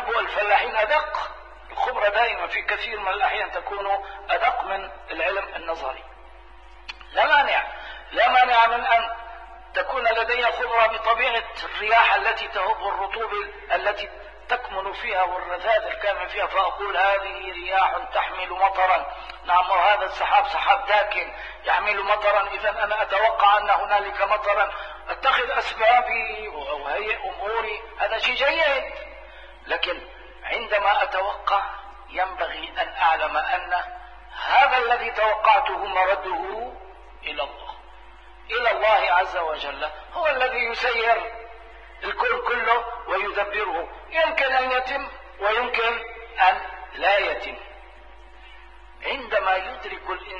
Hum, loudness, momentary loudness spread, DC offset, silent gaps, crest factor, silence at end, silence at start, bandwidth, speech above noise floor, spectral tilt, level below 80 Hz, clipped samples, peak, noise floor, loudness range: none; -22 LUFS; 14 LU; 0.3%; none; 20 dB; 0 s; 0 s; 7.6 kHz; 24 dB; -3 dB/octave; -50 dBFS; under 0.1%; -4 dBFS; -47 dBFS; 5 LU